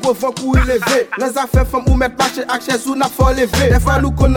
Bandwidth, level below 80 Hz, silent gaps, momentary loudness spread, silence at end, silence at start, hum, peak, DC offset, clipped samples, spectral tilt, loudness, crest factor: 18.5 kHz; -20 dBFS; none; 5 LU; 0 s; 0 s; none; 0 dBFS; under 0.1%; under 0.1%; -5.5 dB/octave; -15 LUFS; 14 dB